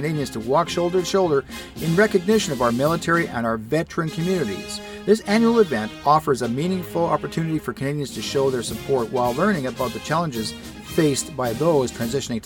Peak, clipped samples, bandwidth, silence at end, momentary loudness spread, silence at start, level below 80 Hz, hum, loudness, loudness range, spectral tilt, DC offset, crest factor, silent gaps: -4 dBFS; under 0.1%; 18 kHz; 0.05 s; 8 LU; 0 s; -48 dBFS; none; -22 LUFS; 3 LU; -5 dB/octave; under 0.1%; 18 dB; none